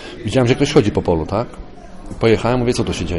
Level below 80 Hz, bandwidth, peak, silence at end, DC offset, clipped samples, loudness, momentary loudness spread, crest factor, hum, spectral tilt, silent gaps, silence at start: -34 dBFS; 11.5 kHz; -2 dBFS; 0 s; under 0.1%; under 0.1%; -17 LUFS; 12 LU; 16 dB; none; -6 dB/octave; none; 0 s